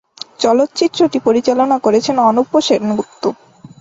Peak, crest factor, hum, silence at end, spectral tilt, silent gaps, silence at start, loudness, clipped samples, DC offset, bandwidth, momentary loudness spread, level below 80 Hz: -2 dBFS; 14 dB; none; 0.15 s; -4.5 dB/octave; none; 0.4 s; -14 LUFS; under 0.1%; under 0.1%; 8 kHz; 8 LU; -58 dBFS